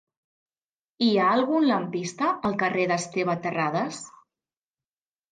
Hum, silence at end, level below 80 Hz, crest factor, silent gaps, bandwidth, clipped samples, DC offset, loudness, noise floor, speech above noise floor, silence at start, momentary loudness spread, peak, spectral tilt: none; 1.2 s; -70 dBFS; 16 dB; none; 9.6 kHz; under 0.1%; under 0.1%; -25 LUFS; under -90 dBFS; over 66 dB; 1 s; 9 LU; -12 dBFS; -5 dB/octave